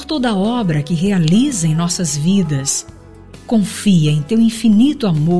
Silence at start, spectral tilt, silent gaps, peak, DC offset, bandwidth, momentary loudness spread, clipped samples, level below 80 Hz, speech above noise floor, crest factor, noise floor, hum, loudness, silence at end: 0 s; -5.5 dB/octave; none; -2 dBFS; 1%; 11 kHz; 5 LU; under 0.1%; -44 dBFS; 24 dB; 12 dB; -38 dBFS; none; -15 LUFS; 0 s